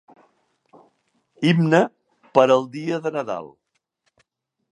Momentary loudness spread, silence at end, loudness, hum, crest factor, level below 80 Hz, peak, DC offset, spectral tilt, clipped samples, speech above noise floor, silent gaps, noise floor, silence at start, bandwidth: 11 LU; 1.25 s; -20 LUFS; none; 22 dB; -72 dBFS; 0 dBFS; under 0.1%; -7 dB/octave; under 0.1%; 53 dB; none; -72 dBFS; 1.4 s; 11 kHz